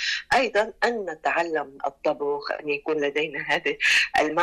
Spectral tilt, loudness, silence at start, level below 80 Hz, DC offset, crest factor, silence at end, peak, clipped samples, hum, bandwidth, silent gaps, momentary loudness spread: -2.5 dB/octave; -24 LUFS; 0 s; -58 dBFS; under 0.1%; 14 dB; 0 s; -12 dBFS; under 0.1%; none; 14 kHz; none; 9 LU